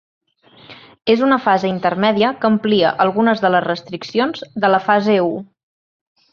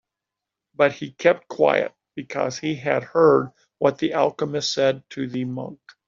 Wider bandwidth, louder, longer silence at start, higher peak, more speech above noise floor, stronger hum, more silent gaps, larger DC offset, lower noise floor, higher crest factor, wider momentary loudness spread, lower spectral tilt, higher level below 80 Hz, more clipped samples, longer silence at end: second, 6.8 kHz vs 7.6 kHz; first, -16 LUFS vs -22 LUFS; about the same, 0.7 s vs 0.8 s; about the same, -2 dBFS vs -2 dBFS; second, 30 dB vs 64 dB; neither; neither; neither; second, -46 dBFS vs -86 dBFS; about the same, 16 dB vs 20 dB; second, 8 LU vs 12 LU; first, -6.5 dB/octave vs -4 dB/octave; first, -60 dBFS vs -66 dBFS; neither; first, 0.9 s vs 0.35 s